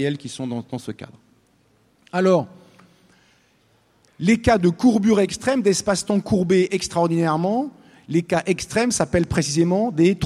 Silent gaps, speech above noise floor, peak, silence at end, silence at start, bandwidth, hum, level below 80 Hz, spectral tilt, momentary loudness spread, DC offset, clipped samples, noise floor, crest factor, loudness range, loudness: none; 41 dB; -2 dBFS; 0 s; 0 s; 13 kHz; none; -46 dBFS; -5.5 dB/octave; 12 LU; under 0.1%; under 0.1%; -60 dBFS; 18 dB; 8 LU; -20 LUFS